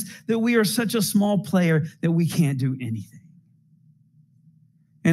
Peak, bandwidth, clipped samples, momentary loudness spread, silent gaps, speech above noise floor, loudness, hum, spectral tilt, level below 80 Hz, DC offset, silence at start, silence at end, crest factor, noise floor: -8 dBFS; 16.5 kHz; under 0.1%; 10 LU; none; 37 dB; -22 LUFS; none; -6 dB/octave; -72 dBFS; under 0.1%; 0 s; 0 s; 16 dB; -58 dBFS